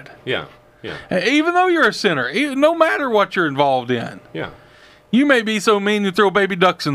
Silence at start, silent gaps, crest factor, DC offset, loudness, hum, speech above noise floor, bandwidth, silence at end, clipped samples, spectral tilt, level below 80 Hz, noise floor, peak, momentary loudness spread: 0.1 s; none; 18 dB; under 0.1%; -17 LUFS; none; 30 dB; 15.5 kHz; 0 s; under 0.1%; -5 dB/octave; -58 dBFS; -47 dBFS; 0 dBFS; 15 LU